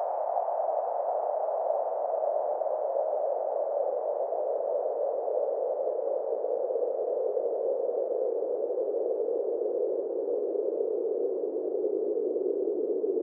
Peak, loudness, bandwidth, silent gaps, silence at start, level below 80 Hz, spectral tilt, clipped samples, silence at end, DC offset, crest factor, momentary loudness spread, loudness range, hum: -16 dBFS; -30 LUFS; 2.3 kHz; none; 0 s; under -90 dBFS; -0.5 dB/octave; under 0.1%; 0 s; under 0.1%; 14 dB; 1 LU; 0 LU; none